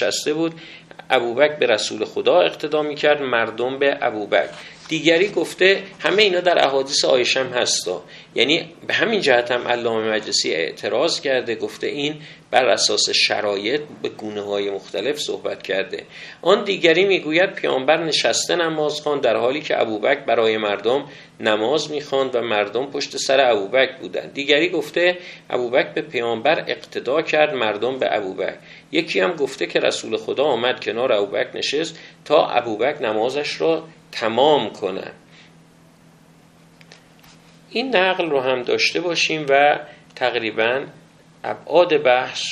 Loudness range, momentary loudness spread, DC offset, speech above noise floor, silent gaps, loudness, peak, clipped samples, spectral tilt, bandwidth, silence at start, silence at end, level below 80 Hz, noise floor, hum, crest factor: 4 LU; 10 LU; under 0.1%; 30 dB; none; -19 LUFS; 0 dBFS; under 0.1%; -3 dB/octave; 13.5 kHz; 0 s; 0 s; -66 dBFS; -50 dBFS; none; 20 dB